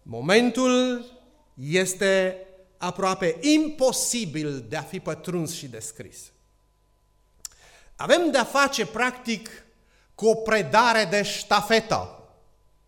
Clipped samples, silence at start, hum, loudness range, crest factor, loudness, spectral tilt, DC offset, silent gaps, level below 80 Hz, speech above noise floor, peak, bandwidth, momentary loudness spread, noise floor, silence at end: under 0.1%; 0.05 s; 50 Hz at -60 dBFS; 9 LU; 20 dB; -23 LUFS; -3.5 dB/octave; under 0.1%; none; -58 dBFS; 40 dB; -4 dBFS; 17.5 kHz; 17 LU; -64 dBFS; 0.7 s